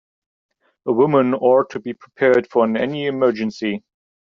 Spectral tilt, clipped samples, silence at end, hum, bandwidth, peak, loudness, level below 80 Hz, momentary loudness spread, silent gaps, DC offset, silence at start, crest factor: -5 dB/octave; under 0.1%; 0.45 s; none; 7.2 kHz; -4 dBFS; -18 LUFS; -64 dBFS; 13 LU; none; under 0.1%; 0.85 s; 16 dB